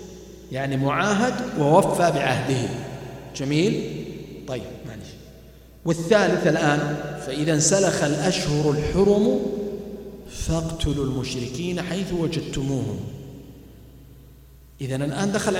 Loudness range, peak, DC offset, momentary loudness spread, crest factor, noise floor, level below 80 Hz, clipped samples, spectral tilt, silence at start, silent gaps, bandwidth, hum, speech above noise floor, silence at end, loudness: 8 LU; -2 dBFS; under 0.1%; 18 LU; 20 dB; -47 dBFS; -42 dBFS; under 0.1%; -5 dB/octave; 0 s; none; 16 kHz; none; 25 dB; 0 s; -23 LUFS